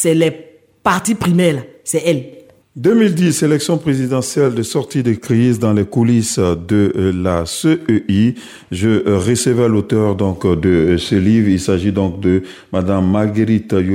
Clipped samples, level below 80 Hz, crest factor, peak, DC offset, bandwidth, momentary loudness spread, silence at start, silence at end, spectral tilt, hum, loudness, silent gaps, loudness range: under 0.1%; -42 dBFS; 14 dB; 0 dBFS; under 0.1%; 16.5 kHz; 5 LU; 0 s; 0 s; -6 dB/octave; none; -15 LUFS; none; 1 LU